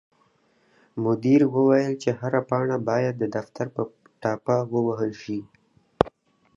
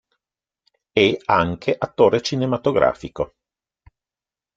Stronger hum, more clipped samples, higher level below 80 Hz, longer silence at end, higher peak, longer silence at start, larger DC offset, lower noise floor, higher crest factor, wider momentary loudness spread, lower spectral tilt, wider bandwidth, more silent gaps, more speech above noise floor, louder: neither; neither; second, -58 dBFS vs -52 dBFS; second, 0.5 s vs 1.3 s; about the same, 0 dBFS vs -2 dBFS; about the same, 0.95 s vs 0.95 s; neither; second, -64 dBFS vs under -90 dBFS; about the same, 24 dB vs 20 dB; about the same, 13 LU vs 11 LU; first, -8 dB/octave vs -5.5 dB/octave; about the same, 7.6 kHz vs 7.8 kHz; neither; second, 41 dB vs over 71 dB; second, -24 LUFS vs -20 LUFS